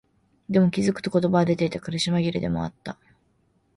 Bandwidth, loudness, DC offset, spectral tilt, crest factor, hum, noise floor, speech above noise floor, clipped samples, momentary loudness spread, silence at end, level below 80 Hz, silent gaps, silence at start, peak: 11.5 kHz; -24 LUFS; under 0.1%; -6.5 dB/octave; 16 dB; none; -66 dBFS; 43 dB; under 0.1%; 14 LU; 0.85 s; -54 dBFS; none; 0.5 s; -8 dBFS